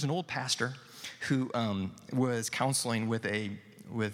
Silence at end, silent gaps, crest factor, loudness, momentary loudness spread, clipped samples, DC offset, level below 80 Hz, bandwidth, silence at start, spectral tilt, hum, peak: 0 s; none; 18 dB; -33 LUFS; 11 LU; under 0.1%; under 0.1%; -74 dBFS; 16.5 kHz; 0 s; -4.5 dB/octave; none; -14 dBFS